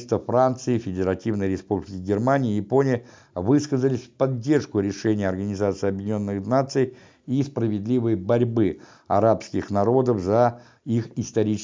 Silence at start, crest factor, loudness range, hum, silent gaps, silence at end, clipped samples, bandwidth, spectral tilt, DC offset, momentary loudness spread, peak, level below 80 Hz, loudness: 0 s; 18 dB; 2 LU; none; none; 0 s; under 0.1%; 7.6 kHz; -7.5 dB/octave; under 0.1%; 7 LU; -6 dBFS; -50 dBFS; -23 LUFS